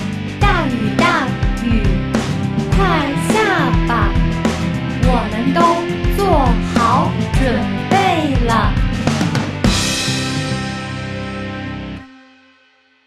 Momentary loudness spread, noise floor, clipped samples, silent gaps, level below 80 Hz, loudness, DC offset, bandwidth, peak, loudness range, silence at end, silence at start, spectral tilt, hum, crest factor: 10 LU; -54 dBFS; under 0.1%; none; -24 dBFS; -16 LUFS; under 0.1%; 14 kHz; 0 dBFS; 4 LU; 0.95 s; 0 s; -5.5 dB/octave; none; 16 dB